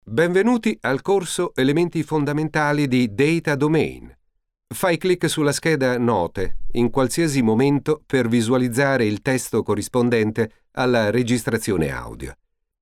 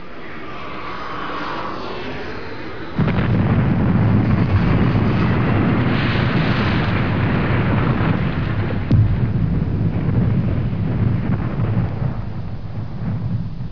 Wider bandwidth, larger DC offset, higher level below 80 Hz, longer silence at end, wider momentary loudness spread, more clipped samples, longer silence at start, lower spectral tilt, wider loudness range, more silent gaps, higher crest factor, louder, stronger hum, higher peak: first, 16 kHz vs 5.4 kHz; second, under 0.1% vs 3%; second, -42 dBFS vs -30 dBFS; first, 0.5 s vs 0 s; second, 6 LU vs 12 LU; neither; about the same, 0.05 s vs 0 s; second, -5.5 dB/octave vs -9 dB/octave; second, 2 LU vs 5 LU; neither; about the same, 14 dB vs 14 dB; about the same, -20 LUFS vs -19 LUFS; neither; about the same, -6 dBFS vs -4 dBFS